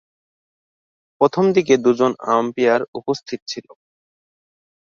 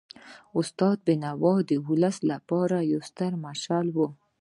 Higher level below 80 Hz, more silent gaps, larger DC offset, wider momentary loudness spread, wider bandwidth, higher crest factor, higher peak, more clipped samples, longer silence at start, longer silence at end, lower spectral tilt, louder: first, -66 dBFS vs -72 dBFS; first, 2.88-2.93 s, 3.42-3.47 s vs none; neither; first, 13 LU vs 7 LU; second, 7.2 kHz vs 11.5 kHz; about the same, 18 dB vs 18 dB; first, -2 dBFS vs -10 dBFS; neither; first, 1.2 s vs 0.25 s; first, 1.3 s vs 0.25 s; second, -5.5 dB/octave vs -7 dB/octave; first, -18 LUFS vs -27 LUFS